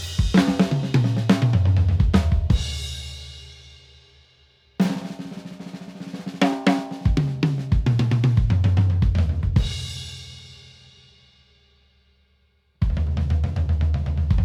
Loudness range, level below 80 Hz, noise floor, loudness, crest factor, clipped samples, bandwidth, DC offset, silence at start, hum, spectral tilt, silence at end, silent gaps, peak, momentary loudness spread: 11 LU; -28 dBFS; -63 dBFS; -22 LUFS; 18 dB; under 0.1%; 12 kHz; under 0.1%; 0 s; none; -7 dB/octave; 0 s; none; -4 dBFS; 18 LU